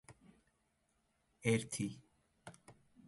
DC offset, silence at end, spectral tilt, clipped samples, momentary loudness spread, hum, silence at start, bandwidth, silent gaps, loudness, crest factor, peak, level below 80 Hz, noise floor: under 0.1%; 0.35 s; -5 dB/octave; under 0.1%; 23 LU; none; 0.1 s; 11.5 kHz; none; -39 LUFS; 24 dB; -20 dBFS; -74 dBFS; -80 dBFS